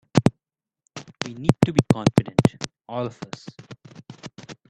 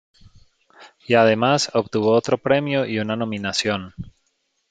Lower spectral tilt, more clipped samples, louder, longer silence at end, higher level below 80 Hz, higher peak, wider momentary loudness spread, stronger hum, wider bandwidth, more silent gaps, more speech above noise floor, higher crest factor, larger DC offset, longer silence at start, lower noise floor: first, -6.5 dB/octave vs -4.5 dB/octave; neither; about the same, -22 LUFS vs -20 LUFS; second, 0.15 s vs 0.6 s; first, -50 dBFS vs -56 dBFS; about the same, 0 dBFS vs -2 dBFS; first, 23 LU vs 11 LU; neither; first, 12 kHz vs 9.4 kHz; neither; first, 64 dB vs 50 dB; about the same, 24 dB vs 20 dB; neither; second, 0.15 s vs 0.8 s; first, -86 dBFS vs -70 dBFS